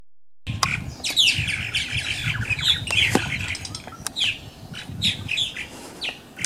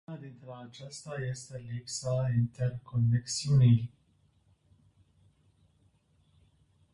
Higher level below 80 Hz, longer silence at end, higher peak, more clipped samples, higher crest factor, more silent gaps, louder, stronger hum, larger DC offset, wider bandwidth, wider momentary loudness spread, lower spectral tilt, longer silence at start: first, -46 dBFS vs -60 dBFS; second, 0 s vs 3.05 s; first, -2 dBFS vs -14 dBFS; neither; about the same, 24 dB vs 20 dB; neither; first, -22 LUFS vs -30 LUFS; neither; neither; first, 16 kHz vs 11.5 kHz; second, 16 LU vs 21 LU; second, -2 dB/octave vs -6 dB/octave; about the same, 0 s vs 0.1 s